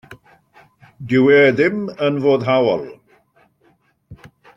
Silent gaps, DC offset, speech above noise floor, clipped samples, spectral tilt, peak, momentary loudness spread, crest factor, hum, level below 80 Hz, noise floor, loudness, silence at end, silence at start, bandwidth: none; under 0.1%; 44 dB; under 0.1%; -7.5 dB/octave; -2 dBFS; 13 LU; 16 dB; none; -58 dBFS; -59 dBFS; -16 LUFS; 0.3 s; 0.1 s; 7.4 kHz